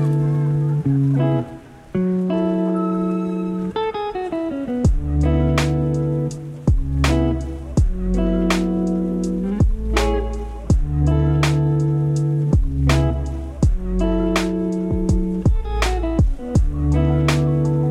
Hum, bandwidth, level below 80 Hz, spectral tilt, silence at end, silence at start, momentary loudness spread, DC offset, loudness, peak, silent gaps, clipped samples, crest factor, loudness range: none; 12.5 kHz; -24 dBFS; -7.5 dB/octave; 0 s; 0 s; 6 LU; under 0.1%; -20 LUFS; -2 dBFS; none; under 0.1%; 16 dB; 2 LU